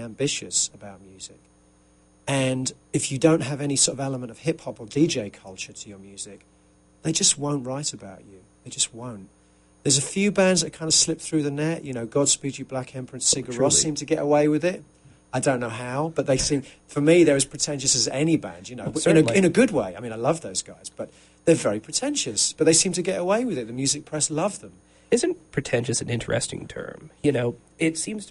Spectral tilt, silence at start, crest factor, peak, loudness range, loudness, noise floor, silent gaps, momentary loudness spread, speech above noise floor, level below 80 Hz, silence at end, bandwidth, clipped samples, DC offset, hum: -3.5 dB/octave; 0 s; 20 dB; -4 dBFS; 5 LU; -23 LUFS; -58 dBFS; none; 18 LU; 34 dB; -54 dBFS; 0.05 s; 11.5 kHz; under 0.1%; under 0.1%; none